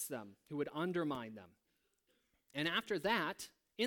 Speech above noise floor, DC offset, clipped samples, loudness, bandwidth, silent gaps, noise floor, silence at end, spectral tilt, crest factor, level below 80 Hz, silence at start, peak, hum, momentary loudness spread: 40 dB; under 0.1%; under 0.1%; -40 LUFS; 19 kHz; none; -80 dBFS; 0 s; -4 dB/octave; 20 dB; -76 dBFS; 0 s; -20 dBFS; none; 14 LU